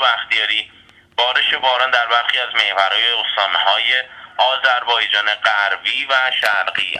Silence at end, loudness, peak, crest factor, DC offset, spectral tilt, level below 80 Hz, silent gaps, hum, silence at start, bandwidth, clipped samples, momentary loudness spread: 0 s; -15 LUFS; 0 dBFS; 18 dB; under 0.1%; 0 dB/octave; -64 dBFS; none; none; 0 s; 13.5 kHz; under 0.1%; 4 LU